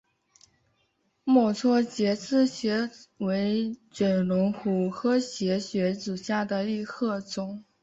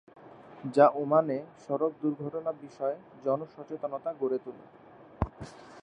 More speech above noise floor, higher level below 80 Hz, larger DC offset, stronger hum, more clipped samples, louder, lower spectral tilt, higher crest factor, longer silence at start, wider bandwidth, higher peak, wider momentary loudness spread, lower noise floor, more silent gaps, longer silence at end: first, 46 dB vs 17 dB; second, -68 dBFS vs -54 dBFS; neither; neither; neither; first, -27 LUFS vs -30 LUFS; second, -6 dB/octave vs -8.5 dB/octave; second, 18 dB vs 24 dB; first, 1.25 s vs 0.2 s; second, 8 kHz vs 9.2 kHz; about the same, -10 dBFS vs -8 dBFS; second, 10 LU vs 20 LU; first, -72 dBFS vs -47 dBFS; neither; first, 0.2 s vs 0 s